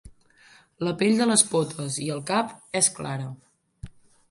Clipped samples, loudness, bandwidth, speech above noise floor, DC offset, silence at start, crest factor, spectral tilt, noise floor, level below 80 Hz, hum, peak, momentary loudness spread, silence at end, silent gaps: under 0.1%; -24 LUFS; 11.5 kHz; 31 dB; under 0.1%; 0.05 s; 24 dB; -3.5 dB/octave; -56 dBFS; -56 dBFS; none; -2 dBFS; 13 LU; 0.4 s; none